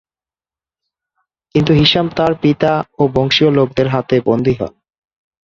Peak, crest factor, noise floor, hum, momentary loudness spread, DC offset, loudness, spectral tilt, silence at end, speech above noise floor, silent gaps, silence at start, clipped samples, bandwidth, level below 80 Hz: 0 dBFS; 16 dB; under -90 dBFS; none; 7 LU; under 0.1%; -14 LUFS; -7 dB/octave; 0.8 s; over 77 dB; none; 1.55 s; under 0.1%; 7.4 kHz; -42 dBFS